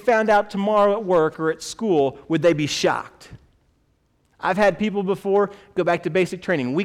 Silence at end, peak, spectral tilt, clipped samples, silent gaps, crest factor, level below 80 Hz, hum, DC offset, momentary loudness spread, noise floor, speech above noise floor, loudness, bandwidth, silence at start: 0 s; -8 dBFS; -5.5 dB/octave; under 0.1%; none; 14 dB; -56 dBFS; none; under 0.1%; 7 LU; -64 dBFS; 44 dB; -21 LUFS; 14.5 kHz; 0.05 s